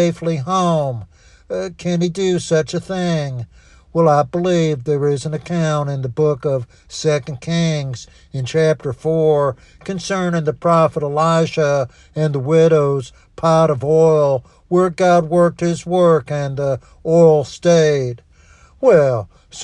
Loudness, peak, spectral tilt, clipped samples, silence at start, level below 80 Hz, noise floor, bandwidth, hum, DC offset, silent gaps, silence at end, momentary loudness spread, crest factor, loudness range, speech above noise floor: -17 LUFS; 0 dBFS; -6.5 dB/octave; under 0.1%; 0 s; -50 dBFS; -48 dBFS; 10.5 kHz; none; under 0.1%; none; 0 s; 12 LU; 16 dB; 5 LU; 31 dB